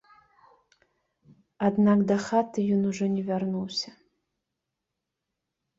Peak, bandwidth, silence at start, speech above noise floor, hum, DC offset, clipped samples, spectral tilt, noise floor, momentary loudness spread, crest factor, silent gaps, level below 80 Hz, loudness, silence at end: -10 dBFS; 7.8 kHz; 1.6 s; 60 dB; none; under 0.1%; under 0.1%; -6.5 dB/octave; -85 dBFS; 9 LU; 18 dB; none; -68 dBFS; -26 LUFS; 1.9 s